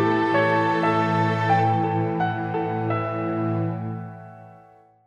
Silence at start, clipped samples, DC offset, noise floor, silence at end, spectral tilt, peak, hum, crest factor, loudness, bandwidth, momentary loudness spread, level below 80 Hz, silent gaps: 0 s; under 0.1%; under 0.1%; -52 dBFS; 0.5 s; -8 dB/octave; -8 dBFS; none; 14 dB; -23 LUFS; 7.6 kHz; 12 LU; -64 dBFS; none